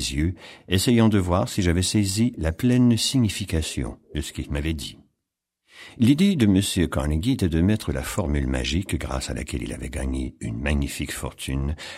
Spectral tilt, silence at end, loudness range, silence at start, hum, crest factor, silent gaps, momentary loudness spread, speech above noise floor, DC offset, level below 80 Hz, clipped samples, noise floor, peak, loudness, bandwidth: -5.5 dB/octave; 0 s; 6 LU; 0 s; none; 18 dB; none; 12 LU; 60 dB; under 0.1%; -34 dBFS; under 0.1%; -82 dBFS; -4 dBFS; -23 LUFS; 16 kHz